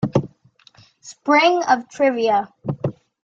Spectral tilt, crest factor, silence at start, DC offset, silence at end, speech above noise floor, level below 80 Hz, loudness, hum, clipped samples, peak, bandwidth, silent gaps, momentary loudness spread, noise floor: -5.5 dB/octave; 18 dB; 0 s; under 0.1%; 0.3 s; 35 dB; -56 dBFS; -19 LUFS; none; under 0.1%; -2 dBFS; 8 kHz; none; 14 LU; -53 dBFS